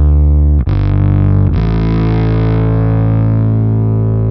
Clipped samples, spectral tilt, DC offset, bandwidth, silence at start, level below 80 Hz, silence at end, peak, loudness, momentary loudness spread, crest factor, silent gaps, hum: under 0.1%; -11.5 dB/octave; under 0.1%; 5.2 kHz; 0 s; -16 dBFS; 0 s; -2 dBFS; -12 LUFS; 3 LU; 8 dB; none; none